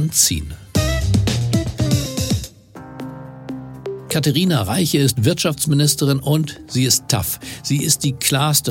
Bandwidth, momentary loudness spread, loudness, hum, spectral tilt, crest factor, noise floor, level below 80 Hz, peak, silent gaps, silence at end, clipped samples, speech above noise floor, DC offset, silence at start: 17 kHz; 16 LU; -18 LUFS; none; -4 dB/octave; 18 dB; -38 dBFS; -34 dBFS; -2 dBFS; none; 0 s; under 0.1%; 20 dB; under 0.1%; 0 s